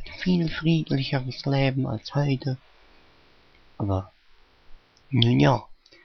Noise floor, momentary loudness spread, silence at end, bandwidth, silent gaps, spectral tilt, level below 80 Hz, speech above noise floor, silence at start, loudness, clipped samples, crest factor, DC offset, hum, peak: -56 dBFS; 10 LU; 0.3 s; 6.4 kHz; none; -7.5 dB/octave; -48 dBFS; 33 dB; 0 s; -25 LUFS; under 0.1%; 24 dB; under 0.1%; none; -2 dBFS